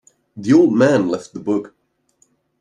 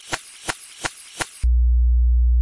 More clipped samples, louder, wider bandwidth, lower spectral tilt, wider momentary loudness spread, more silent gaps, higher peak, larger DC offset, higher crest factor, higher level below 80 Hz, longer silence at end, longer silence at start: neither; first, -17 LUFS vs -23 LUFS; second, 9.8 kHz vs 11.5 kHz; first, -7 dB/octave vs -4 dB/octave; about the same, 11 LU vs 11 LU; neither; first, -2 dBFS vs -6 dBFS; neither; about the same, 16 dB vs 14 dB; second, -64 dBFS vs -20 dBFS; first, 0.95 s vs 0 s; first, 0.35 s vs 0.05 s